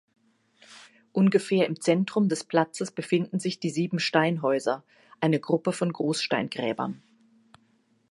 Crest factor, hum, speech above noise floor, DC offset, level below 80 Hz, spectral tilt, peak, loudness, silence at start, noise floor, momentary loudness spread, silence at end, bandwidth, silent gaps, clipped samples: 22 dB; none; 41 dB; under 0.1%; -76 dBFS; -5.5 dB/octave; -6 dBFS; -26 LUFS; 0.7 s; -66 dBFS; 7 LU; 1.15 s; 11.5 kHz; none; under 0.1%